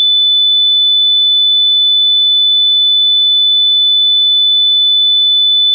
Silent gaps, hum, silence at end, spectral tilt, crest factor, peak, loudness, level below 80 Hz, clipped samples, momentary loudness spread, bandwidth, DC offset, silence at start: none; none; 0 s; 13.5 dB/octave; 4 dB; -6 dBFS; -6 LUFS; under -90 dBFS; under 0.1%; 0 LU; 3.7 kHz; under 0.1%; 0 s